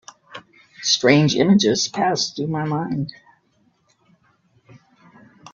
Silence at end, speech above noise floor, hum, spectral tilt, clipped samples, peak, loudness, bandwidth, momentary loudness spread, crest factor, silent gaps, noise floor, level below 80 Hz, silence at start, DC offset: 2.45 s; 44 dB; none; -4.5 dB/octave; under 0.1%; 0 dBFS; -19 LUFS; 7.6 kHz; 25 LU; 22 dB; none; -63 dBFS; -60 dBFS; 0.3 s; under 0.1%